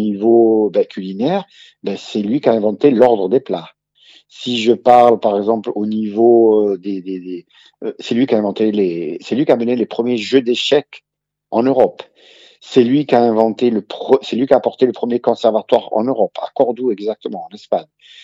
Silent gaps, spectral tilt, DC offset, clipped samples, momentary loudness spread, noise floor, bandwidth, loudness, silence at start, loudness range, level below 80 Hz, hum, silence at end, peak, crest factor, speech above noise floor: none; -6.5 dB/octave; under 0.1%; under 0.1%; 13 LU; -49 dBFS; 7.8 kHz; -15 LUFS; 0 s; 4 LU; -66 dBFS; none; 0.4 s; 0 dBFS; 16 dB; 34 dB